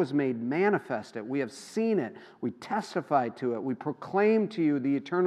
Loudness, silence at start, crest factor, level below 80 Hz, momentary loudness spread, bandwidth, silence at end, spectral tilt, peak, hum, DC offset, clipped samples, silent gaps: -29 LUFS; 0 s; 18 dB; -84 dBFS; 10 LU; 12 kHz; 0 s; -7 dB/octave; -12 dBFS; none; under 0.1%; under 0.1%; none